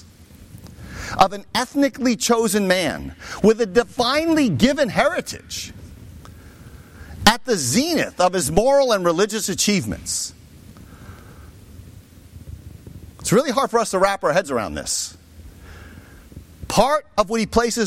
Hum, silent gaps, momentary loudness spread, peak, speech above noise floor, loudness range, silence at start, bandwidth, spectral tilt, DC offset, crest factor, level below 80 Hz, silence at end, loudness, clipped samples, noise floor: none; none; 18 LU; 0 dBFS; 26 dB; 7 LU; 0.4 s; 16.5 kHz; -3.5 dB/octave; under 0.1%; 20 dB; -42 dBFS; 0 s; -19 LUFS; under 0.1%; -45 dBFS